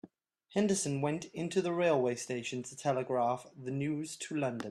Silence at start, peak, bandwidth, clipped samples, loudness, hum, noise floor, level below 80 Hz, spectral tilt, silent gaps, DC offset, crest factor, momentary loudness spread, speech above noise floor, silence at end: 0.05 s; -16 dBFS; 13 kHz; under 0.1%; -34 LUFS; none; -60 dBFS; -74 dBFS; -5 dB/octave; none; under 0.1%; 18 dB; 8 LU; 27 dB; 0 s